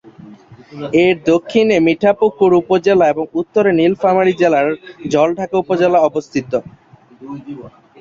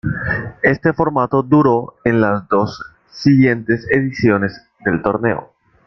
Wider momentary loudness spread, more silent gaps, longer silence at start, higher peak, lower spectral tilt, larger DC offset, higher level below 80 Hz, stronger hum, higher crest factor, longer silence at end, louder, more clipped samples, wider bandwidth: first, 15 LU vs 10 LU; neither; first, 0.2 s vs 0.05 s; about the same, -2 dBFS vs -2 dBFS; second, -6.5 dB/octave vs -8.5 dB/octave; neither; second, -54 dBFS vs -46 dBFS; neither; about the same, 14 dB vs 14 dB; about the same, 0.3 s vs 0.4 s; about the same, -14 LUFS vs -16 LUFS; neither; first, 7.6 kHz vs 6.4 kHz